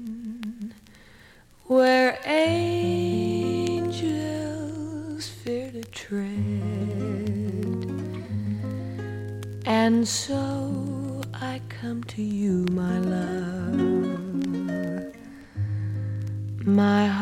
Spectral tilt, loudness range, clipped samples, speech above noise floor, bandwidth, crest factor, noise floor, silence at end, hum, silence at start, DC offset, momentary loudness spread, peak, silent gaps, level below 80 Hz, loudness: -6 dB/octave; 6 LU; under 0.1%; 26 dB; 16 kHz; 18 dB; -52 dBFS; 0 s; none; 0 s; under 0.1%; 13 LU; -8 dBFS; none; -56 dBFS; -26 LUFS